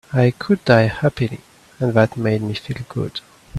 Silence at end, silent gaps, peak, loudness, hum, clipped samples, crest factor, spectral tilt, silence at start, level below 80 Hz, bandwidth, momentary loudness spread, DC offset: 0 s; none; 0 dBFS; -19 LUFS; none; under 0.1%; 18 dB; -7.5 dB/octave; 0.1 s; -48 dBFS; 12.5 kHz; 13 LU; under 0.1%